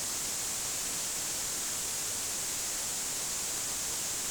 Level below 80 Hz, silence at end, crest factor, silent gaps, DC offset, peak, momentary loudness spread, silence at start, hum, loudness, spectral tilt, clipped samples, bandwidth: -58 dBFS; 0 s; 10 dB; none; under 0.1%; -24 dBFS; 0 LU; 0 s; none; -31 LUFS; 0 dB/octave; under 0.1%; over 20 kHz